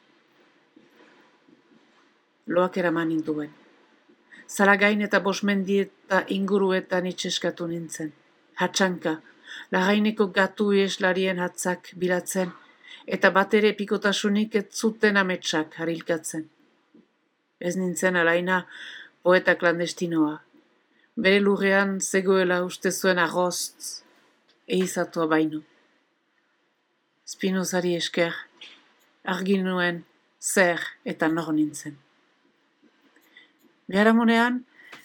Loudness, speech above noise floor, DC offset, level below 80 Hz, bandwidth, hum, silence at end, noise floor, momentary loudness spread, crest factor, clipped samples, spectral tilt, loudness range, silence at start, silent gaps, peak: -24 LUFS; 47 dB; under 0.1%; -78 dBFS; 18 kHz; none; 0.05 s; -71 dBFS; 14 LU; 22 dB; under 0.1%; -4.5 dB/octave; 6 LU; 2.45 s; none; -4 dBFS